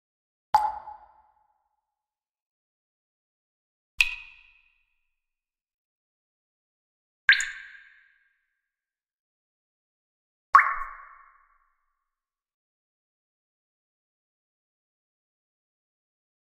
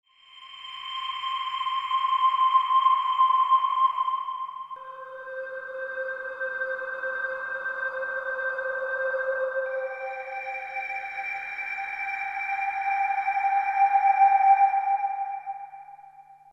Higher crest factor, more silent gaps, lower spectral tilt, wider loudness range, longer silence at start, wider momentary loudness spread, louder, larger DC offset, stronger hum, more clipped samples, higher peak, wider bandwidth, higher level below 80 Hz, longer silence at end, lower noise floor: first, 32 dB vs 16 dB; first, 2.29-2.34 s, 2.42-3.98 s, 5.61-5.65 s, 5.74-7.28 s, 9.19-10.53 s vs none; second, 2 dB/octave vs -1 dB/octave; about the same, 6 LU vs 8 LU; first, 0.55 s vs 0.35 s; first, 24 LU vs 15 LU; first, -23 LUFS vs -26 LUFS; neither; neither; neither; first, -2 dBFS vs -10 dBFS; first, 10 kHz vs 7.8 kHz; first, -58 dBFS vs -72 dBFS; first, 5.5 s vs 0.2 s; first, under -90 dBFS vs -50 dBFS